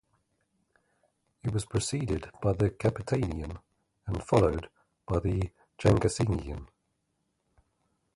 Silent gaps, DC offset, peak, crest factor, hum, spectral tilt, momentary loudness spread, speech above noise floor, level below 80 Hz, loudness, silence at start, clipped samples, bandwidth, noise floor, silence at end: none; under 0.1%; -8 dBFS; 24 dB; none; -6.5 dB/octave; 13 LU; 50 dB; -44 dBFS; -30 LUFS; 1.45 s; under 0.1%; 11.5 kHz; -78 dBFS; 1.5 s